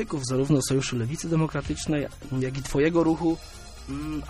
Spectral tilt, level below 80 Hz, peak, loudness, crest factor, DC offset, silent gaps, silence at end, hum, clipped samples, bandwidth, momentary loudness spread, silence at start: -5.5 dB/octave; -42 dBFS; -10 dBFS; -26 LUFS; 16 dB; under 0.1%; none; 0 s; none; under 0.1%; 14 kHz; 11 LU; 0 s